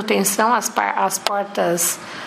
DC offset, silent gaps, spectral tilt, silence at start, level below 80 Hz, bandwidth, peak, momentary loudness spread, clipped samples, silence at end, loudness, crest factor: under 0.1%; none; -2.5 dB/octave; 0 s; -68 dBFS; 15.5 kHz; 0 dBFS; 4 LU; under 0.1%; 0 s; -19 LUFS; 20 dB